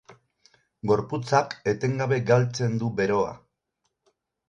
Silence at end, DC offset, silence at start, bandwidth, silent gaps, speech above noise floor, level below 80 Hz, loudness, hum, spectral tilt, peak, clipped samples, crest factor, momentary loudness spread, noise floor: 1.1 s; under 0.1%; 0.1 s; 7.8 kHz; none; 54 dB; -58 dBFS; -25 LUFS; none; -6.5 dB/octave; -6 dBFS; under 0.1%; 20 dB; 5 LU; -78 dBFS